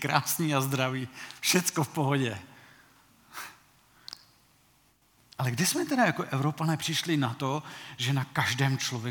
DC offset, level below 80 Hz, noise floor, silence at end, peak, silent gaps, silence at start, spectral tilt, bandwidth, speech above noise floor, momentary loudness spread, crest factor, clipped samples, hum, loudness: under 0.1%; -74 dBFS; -65 dBFS; 0 s; -6 dBFS; none; 0 s; -4 dB/octave; 19 kHz; 36 dB; 19 LU; 24 dB; under 0.1%; none; -28 LUFS